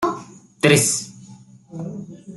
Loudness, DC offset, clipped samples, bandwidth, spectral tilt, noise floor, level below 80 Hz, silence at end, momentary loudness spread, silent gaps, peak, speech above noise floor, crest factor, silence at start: -18 LUFS; under 0.1%; under 0.1%; 12.5 kHz; -3.5 dB/octave; -44 dBFS; -60 dBFS; 0 s; 21 LU; none; -2 dBFS; 25 dB; 22 dB; 0 s